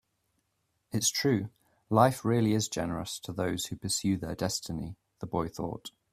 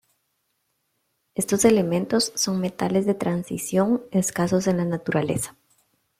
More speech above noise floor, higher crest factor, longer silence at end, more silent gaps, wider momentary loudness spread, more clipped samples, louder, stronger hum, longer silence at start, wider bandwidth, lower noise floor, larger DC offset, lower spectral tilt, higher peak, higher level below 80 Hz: about the same, 48 dB vs 51 dB; about the same, 24 dB vs 20 dB; second, 0.25 s vs 0.7 s; neither; first, 13 LU vs 9 LU; neither; second, -30 LUFS vs -23 LUFS; neither; second, 0.95 s vs 1.35 s; about the same, 16 kHz vs 15.5 kHz; first, -78 dBFS vs -73 dBFS; neither; about the same, -4.5 dB/octave vs -5 dB/octave; second, -8 dBFS vs -4 dBFS; about the same, -58 dBFS vs -60 dBFS